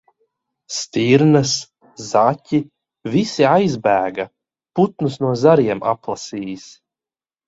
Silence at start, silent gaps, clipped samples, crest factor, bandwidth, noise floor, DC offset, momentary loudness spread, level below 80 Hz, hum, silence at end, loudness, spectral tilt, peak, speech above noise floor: 0.7 s; none; under 0.1%; 18 dB; 8 kHz; under -90 dBFS; under 0.1%; 17 LU; -58 dBFS; none; 0.8 s; -18 LUFS; -5.5 dB/octave; 0 dBFS; over 73 dB